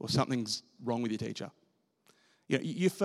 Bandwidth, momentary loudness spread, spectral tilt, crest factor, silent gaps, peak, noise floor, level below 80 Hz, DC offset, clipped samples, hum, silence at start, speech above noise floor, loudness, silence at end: 15.5 kHz; 10 LU; -5 dB/octave; 20 dB; none; -14 dBFS; -70 dBFS; -72 dBFS; under 0.1%; under 0.1%; none; 0 s; 37 dB; -34 LUFS; 0 s